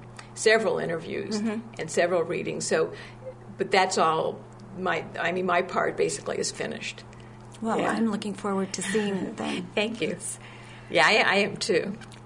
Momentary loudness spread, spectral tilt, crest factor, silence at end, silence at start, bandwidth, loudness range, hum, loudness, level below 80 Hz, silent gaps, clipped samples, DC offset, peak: 19 LU; -3.5 dB/octave; 22 dB; 0 s; 0 s; 11 kHz; 4 LU; none; -26 LUFS; -60 dBFS; none; under 0.1%; under 0.1%; -6 dBFS